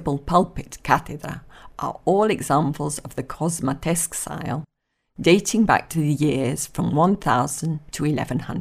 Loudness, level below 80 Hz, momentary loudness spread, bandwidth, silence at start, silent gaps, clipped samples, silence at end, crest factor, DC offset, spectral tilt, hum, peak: -22 LUFS; -46 dBFS; 13 LU; 15.5 kHz; 0 s; none; under 0.1%; 0 s; 22 dB; under 0.1%; -5 dB/octave; none; 0 dBFS